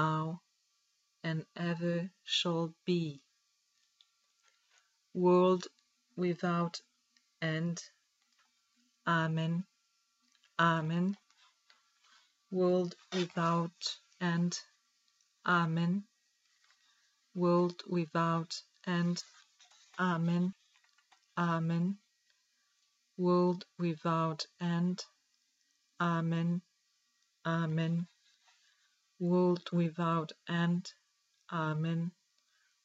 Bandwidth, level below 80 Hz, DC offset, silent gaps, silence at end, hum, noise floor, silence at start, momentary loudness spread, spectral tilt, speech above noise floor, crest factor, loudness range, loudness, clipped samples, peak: 7.8 kHz; -86 dBFS; under 0.1%; none; 0.75 s; none; -77 dBFS; 0 s; 13 LU; -6.5 dB/octave; 45 dB; 18 dB; 3 LU; -34 LUFS; under 0.1%; -16 dBFS